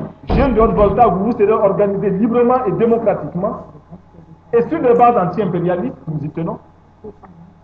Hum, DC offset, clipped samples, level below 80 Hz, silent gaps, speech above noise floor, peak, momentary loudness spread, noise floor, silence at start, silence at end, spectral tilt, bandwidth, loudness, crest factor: none; under 0.1%; under 0.1%; -32 dBFS; none; 27 dB; 0 dBFS; 12 LU; -42 dBFS; 0 s; 0.2 s; -10.5 dB/octave; 5.4 kHz; -15 LUFS; 16 dB